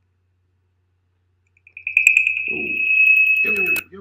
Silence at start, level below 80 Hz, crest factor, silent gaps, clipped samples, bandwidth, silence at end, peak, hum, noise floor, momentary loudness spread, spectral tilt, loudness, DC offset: 1.75 s; -70 dBFS; 20 dB; none; under 0.1%; 16 kHz; 0 s; 0 dBFS; none; -66 dBFS; 10 LU; -1.5 dB/octave; -14 LUFS; under 0.1%